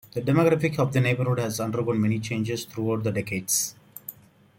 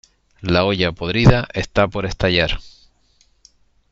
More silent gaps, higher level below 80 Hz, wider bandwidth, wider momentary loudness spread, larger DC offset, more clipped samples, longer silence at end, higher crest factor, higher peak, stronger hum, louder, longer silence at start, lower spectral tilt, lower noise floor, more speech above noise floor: neither; second, -60 dBFS vs -34 dBFS; first, 16.5 kHz vs 7.8 kHz; about the same, 10 LU vs 8 LU; neither; neither; second, 0.45 s vs 1.25 s; about the same, 16 dB vs 18 dB; second, -8 dBFS vs -2 dBFS; neither; second, -25 LUFS vs -18 LUFS; second, 0.15 s vs 0.4 s; second, -5 dB/octave vs -6.5 dB/octave; second, -45 dBFS vs -58 dBFS; second, 21 dB vs 41 dB